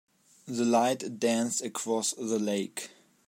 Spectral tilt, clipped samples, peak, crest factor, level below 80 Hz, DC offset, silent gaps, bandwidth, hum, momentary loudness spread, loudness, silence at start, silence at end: -3.5 dB/octave; under 0.1%; -14 dBFS; 18 dB; -82 dBFS; under 0.1%; none; 16 kHz; none; 12 LU; -29 LUFS; 0.45 s; 0.4 s